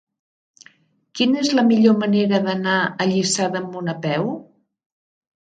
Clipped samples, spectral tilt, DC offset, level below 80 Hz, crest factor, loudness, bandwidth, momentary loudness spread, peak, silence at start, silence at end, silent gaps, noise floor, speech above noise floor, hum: under 0.1%; -4.5 dB/octave; under 0.1%; -66 dBFS; 18 dB; -19 LUFS; 9.4 kHz; 11 LU; -4 dBFS; 1.15 s; 1.05 s; none; -54 dBFS; 36 dB; none